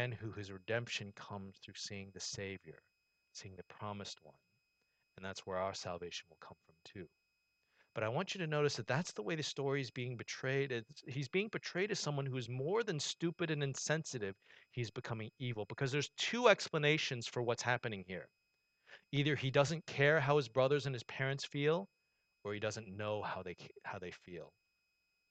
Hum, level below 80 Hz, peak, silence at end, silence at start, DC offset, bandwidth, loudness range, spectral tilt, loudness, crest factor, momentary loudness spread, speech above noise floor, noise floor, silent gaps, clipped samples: none; -76 dBFS; -12 dBFS; 0.8 s; 0 s; under 0.1%; 9 kHz; 12 LU; -4.5 dB/octave; -38 LUFS; 26 dB; 17 LU; 44 dB; -83 dBFS; none; under 0.1%